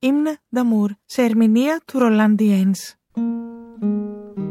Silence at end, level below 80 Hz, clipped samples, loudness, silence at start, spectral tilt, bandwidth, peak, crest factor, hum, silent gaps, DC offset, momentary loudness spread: 0 s; -68 dBFS; under 0.1%; -19 LUFS; 0 s; -6.5 dB/octave; 14 kHz; -4 dBFS; 14 dB; none; none; under 0.1%; 14 LU